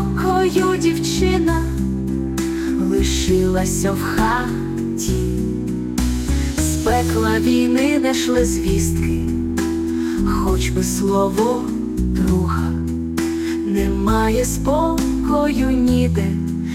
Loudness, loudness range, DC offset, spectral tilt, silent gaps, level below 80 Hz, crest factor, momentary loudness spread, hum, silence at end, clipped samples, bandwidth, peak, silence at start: -19 LUFS; 2 LU; under 0.1%; -5.5 dB/octave; none; -28 dBFS; 14 dB; 6 LU; none; 0 s; under 0.1%; 16.5 kHz; -4 dBFS; 0 s